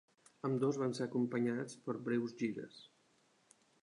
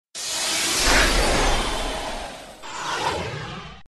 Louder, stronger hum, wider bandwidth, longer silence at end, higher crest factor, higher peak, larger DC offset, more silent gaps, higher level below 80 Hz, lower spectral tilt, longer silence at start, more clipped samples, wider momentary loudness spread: second, -38 LUFS vs -22 LUFS; neither; second, 11 kHz vs 13 kHz; first, 1 s vs 0 s; about the same, 16 dB vs 18 dB; second, -24 dBFS vs -6 dBFS; neither; neither; second, -86 dBFS vs -30 dBFS; first, -6.5 dB/octave vs -2 dB/octave; first, 0.45 s vs 0.15 s; neither; second, 10 LU vs 17 LU